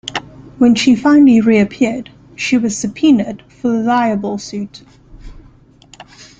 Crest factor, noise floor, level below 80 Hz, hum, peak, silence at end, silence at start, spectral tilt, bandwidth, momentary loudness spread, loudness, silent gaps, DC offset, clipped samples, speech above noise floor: 14 dB; -45 dBFS; -46 dBFS; 50 Hz at -45 dBFS; -2 dBFS; 1 s; 0.05 s; -5 dB/octave; 9.2 kHz; 17 LU; -13 LUFS; none; under 0.1%; under 0.1%; 32 dB